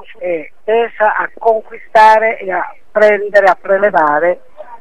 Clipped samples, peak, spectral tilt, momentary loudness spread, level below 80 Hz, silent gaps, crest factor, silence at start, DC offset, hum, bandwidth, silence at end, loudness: 0.3%; 0 dBFS; -5 dB/octave; 12 LU; -56 dBFS; none; 12 dB; 0.1 s; 2%; none; 10 kHz; 0.05 s; -12 LUFS